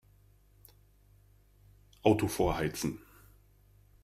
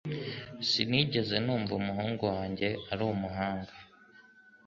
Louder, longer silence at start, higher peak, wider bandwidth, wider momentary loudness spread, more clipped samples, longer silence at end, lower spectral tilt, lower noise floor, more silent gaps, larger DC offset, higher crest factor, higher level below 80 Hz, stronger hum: about the same, -31 LUFS vs -32 LUFS; first, 2.05 s vs 0.05 s; about the same, -10 dBFS vs -10 dBFS; first, 15.5 kHz vs 7.6 kHz; about the same, 10 LU vs 10 LU; neither; first, 1.05 s vs 0.25 s; about the same, -5.5 dB/octave vs -6 dB/octave; first, -63 dBFS vs -58 dBFS; neither; neither; about the same, 26 dB vs 24 dB; first, -52 dBFS vs -58 dBFS; first, 50 Hz at -55 dBFS vs none